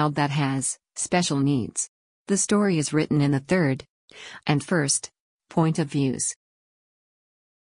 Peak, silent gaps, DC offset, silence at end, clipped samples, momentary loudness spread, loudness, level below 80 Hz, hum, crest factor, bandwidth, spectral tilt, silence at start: -8 dBFS; 1.89-2.25 s, 3.90-4.08 s, 5.20-5.40 s; under 0.1%; 1.45 s; under 0.1%; 10 LU; -24 LUFS; -60 dBFS; none; 16 dB; 11 kHz; -4.5 dB/octave; 0 s